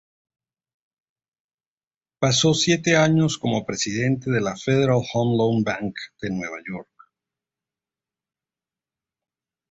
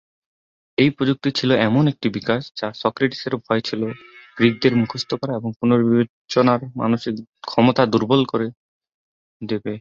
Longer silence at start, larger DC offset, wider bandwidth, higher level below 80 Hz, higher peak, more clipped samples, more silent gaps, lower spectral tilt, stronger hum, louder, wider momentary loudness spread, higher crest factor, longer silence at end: first, 2.2 s vs 0.8 s; neither; about the same, 8 kHz vs 7.4 kHz; about the same, -56 dBFS vs -58 dBFS; about the same, -4 dBFS vs -2 dBFS; neither; second, none vs 5.56-5.60 s, 6.09-6.28 s, 7.29-7.33 s, 8.57-8.81 s, 8.94-9.40 s; second, -4.5 dB/octave vs -7 dB/octave; neither; about the same, -21 LUFS vs -20 LUFS; about the same, 14 LU vs 12 LU; about the same, 20 dB vs 18 dB; first, 2.9 s vs 0 s